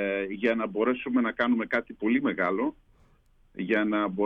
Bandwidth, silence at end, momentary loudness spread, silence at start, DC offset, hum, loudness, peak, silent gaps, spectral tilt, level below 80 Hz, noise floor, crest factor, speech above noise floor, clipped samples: 5.6 kHz; 0 s; 5 LU; 0 s; under 0.1%; none; -27 LUFS; -12 dBFS; none; -8 dB/octave; -62 dBFS; -61 dBFS; 16 dB; 34 dB; under 0.1%